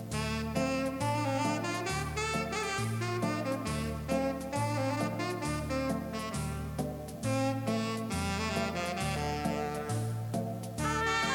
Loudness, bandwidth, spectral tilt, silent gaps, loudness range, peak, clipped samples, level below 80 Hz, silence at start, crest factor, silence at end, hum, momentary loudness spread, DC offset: -33 LUFS; 17.5 kHz; -5 dB/octave; none; 2 LU; -18 dBFS; under 0.1%; -48 dBFS; 0 s; 16 dB; 0 s; none; 5 LU; under 0.1%